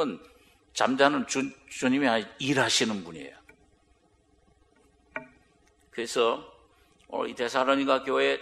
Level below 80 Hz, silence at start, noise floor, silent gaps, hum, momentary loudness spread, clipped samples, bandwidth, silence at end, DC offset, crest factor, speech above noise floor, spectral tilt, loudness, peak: -66 dBFS; 0 s; -65 dBFS; none; none; 18 LU; under 0.1%; 13.5 kHz; 0 s; under 0.1%; 24 dB; 38 dB; -3 dB/octave; -27 LUFS; -4 dBFS